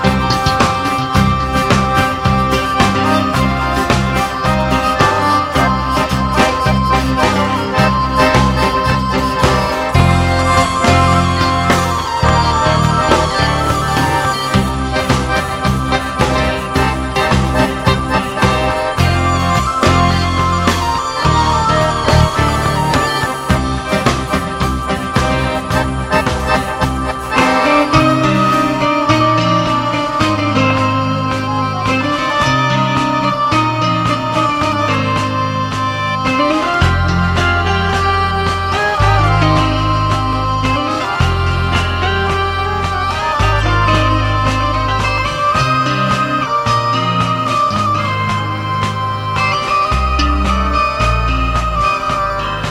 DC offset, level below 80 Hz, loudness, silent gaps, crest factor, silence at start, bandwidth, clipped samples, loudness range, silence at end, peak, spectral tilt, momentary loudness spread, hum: under 0.1%; -24 dBFS; -14 LUFS; none; 14 dB; 0 s; 16 kHz; under 0.1%; 3 LU; 0 s; 0 dBFS; -5.5 dB/octave; 4 LU; none